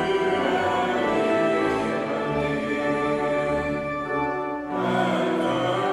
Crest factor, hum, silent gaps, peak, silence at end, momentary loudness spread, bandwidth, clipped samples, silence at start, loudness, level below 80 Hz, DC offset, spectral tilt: 14 dB; none; none; -10 dBFS; 0 s; 5 LU; 13 kHz; under 0.1%; 0 s; -24 LUFS; -52 dBFS; under 0.1%; -6 dB/octave